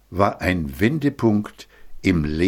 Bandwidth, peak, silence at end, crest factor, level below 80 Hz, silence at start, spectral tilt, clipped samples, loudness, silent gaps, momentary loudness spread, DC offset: 17 kHz; -2 dBFS; 0 s; 20 dB; -38 dBFS; 0.1 s; -7 dB/octave; under 0.1%; -21 LUFS; none; 5 LU; under 0.1%